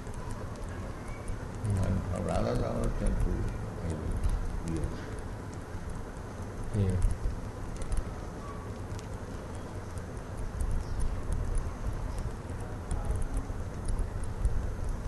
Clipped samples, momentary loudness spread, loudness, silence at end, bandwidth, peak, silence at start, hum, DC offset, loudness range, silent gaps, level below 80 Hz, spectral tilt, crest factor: under 0.1%; 9 LU; -36 LUFS; 0 s; 12 kHz; -14 dBFS; 0 s; none; under 0.1%; 6 LU; none; -36 dBFS; -7 dB/octave; 18 dB